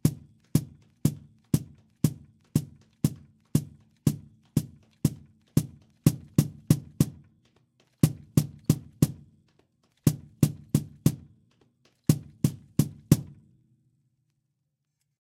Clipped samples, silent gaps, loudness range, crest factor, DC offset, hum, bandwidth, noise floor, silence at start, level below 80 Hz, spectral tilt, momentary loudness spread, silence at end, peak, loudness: under 0.1%; none; 3 LU; 26 dB; under 0.1%; none; 16 kHz; -80 dBFS; 0.05 s; -52 dBFS; -6.5 dB/octave; 19 LU; 2.15 s; -4 dBFS; -29 LUFS